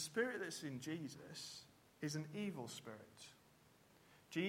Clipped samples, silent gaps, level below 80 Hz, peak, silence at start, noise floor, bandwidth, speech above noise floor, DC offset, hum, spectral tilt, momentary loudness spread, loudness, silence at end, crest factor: under 0.1%; none; -84 dBFS; -28 dBFS; 0 s; -70 dBFS; 16.5 kHz; 23 dB; under 0.1%; none; -4.5 dB/octave; 20 LU; -47 LUFS; 0 s; 20 dB